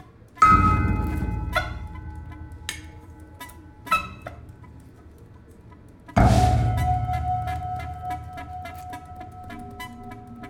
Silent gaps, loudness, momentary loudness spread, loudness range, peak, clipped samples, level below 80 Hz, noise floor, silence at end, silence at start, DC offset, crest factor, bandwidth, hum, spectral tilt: none; -23 LUFS; 24 LU; 10 LU; -4 dBFS; under 0.1%; -34 dBFS; -47 dBFS; 0 s; 0 s; under 0.1%; 22 dB; 16.5 kHz; none; -6.5 dB/octave